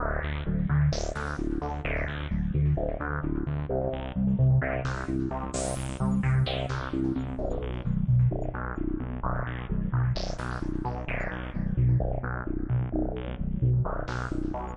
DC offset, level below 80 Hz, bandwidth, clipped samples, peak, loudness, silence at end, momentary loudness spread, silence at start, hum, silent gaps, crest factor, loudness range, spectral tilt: under 0.1%; -36 dBFS; 11 kHz; under 0.1%; -14 dBFS; -29 LUFS; 0 s; 7 LU; 0 s; none; none; 14 dB; 2 LU; -7 dB/octave